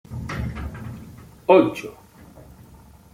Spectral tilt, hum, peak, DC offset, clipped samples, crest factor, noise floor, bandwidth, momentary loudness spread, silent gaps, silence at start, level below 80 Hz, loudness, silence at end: -7 dB/octave; none; -2 dBFS; under 0.1%; under 0.1%; 22 dB; -48 dBFS; 16 kHz; 23 LU; none; 0.1 s; -42 dBFS; -21 LUFS; 0.5 s